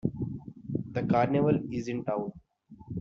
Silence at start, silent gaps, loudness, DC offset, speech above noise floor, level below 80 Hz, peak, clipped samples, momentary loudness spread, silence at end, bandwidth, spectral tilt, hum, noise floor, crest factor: 0.05 s; none; -30 LUFS; under 0.1%; 25 dB; -56 dBFS; -12 dBFS; under 0.1%; 14 LU; 0 s; 7.4 kHz; -8 dB/octave; none; -53 dBFS; 20 dB